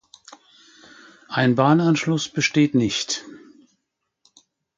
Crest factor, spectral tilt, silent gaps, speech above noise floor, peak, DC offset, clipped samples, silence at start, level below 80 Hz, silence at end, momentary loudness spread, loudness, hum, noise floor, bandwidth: 20 dB; -5 dB/octave; none; 59 dB; -4 dBFS; under 0.1%; under 0.1%; 1.3 s; -60 dBFS; 1.4 s; 10 LU; -20 LUFS; none; -78 dBFS; 9.4 kHz